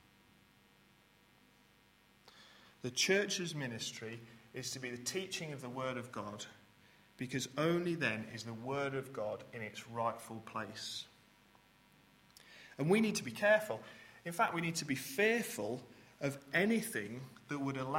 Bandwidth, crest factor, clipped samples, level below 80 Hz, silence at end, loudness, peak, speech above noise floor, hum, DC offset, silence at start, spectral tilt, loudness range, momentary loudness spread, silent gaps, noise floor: 16.5 kHz; 22 dB; under 0.1%; -76 dBFS; 0 s; -37 LUFS; -18 dBFS; 30 dB; none; under 0.1%; 2.25 s; -4 dB/octave; 8 LU; 17 LU; none; -68 dBFS